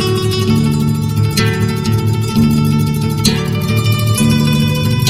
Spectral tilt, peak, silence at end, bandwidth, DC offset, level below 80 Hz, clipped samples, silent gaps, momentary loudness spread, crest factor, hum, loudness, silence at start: -5.5 dB/octave; 0 dBFS; 0 s; 16 kHz; under 0.1%; -32 dBFS; under 0.1%; none; 3 LU; 12 dB; none; -14 LUFS; 0 s